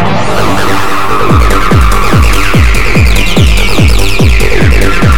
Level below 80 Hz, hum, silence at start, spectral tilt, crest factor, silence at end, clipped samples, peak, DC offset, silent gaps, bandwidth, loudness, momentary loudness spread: -10 dBFS; none; 0 s; -5 dB/octave; 10 dB; 0 s; 0.9%; 0 dBFS; 40%; none; 18.5 kHz; -8 LUFS; 3 LU